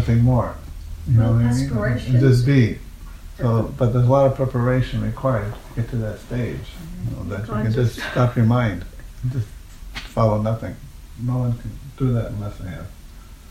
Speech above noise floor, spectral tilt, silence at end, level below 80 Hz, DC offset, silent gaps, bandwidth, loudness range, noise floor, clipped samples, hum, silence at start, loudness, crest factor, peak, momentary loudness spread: 20 dB; -8 dB/octave; 0.05 s; -36 dBFS; under 0.1%; none; 13 kHz; 6 LU; -40 dBFS; under 0.1%; none; 0 s; -21 LUFS; 16 dB; -4 dBFS; 19 LU